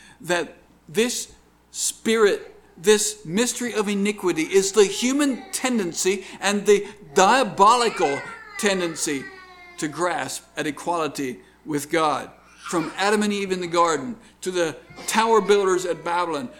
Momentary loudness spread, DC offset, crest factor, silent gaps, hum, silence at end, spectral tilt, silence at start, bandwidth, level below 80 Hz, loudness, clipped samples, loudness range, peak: 13 LU; under 0.1%; 22 dB; none; none; 0 s; -3 dB/octave; 0.2 s; 19 kHz; -60 dBFS; -22 LUFS; under 0.1%; 6 LU; 0 dBFS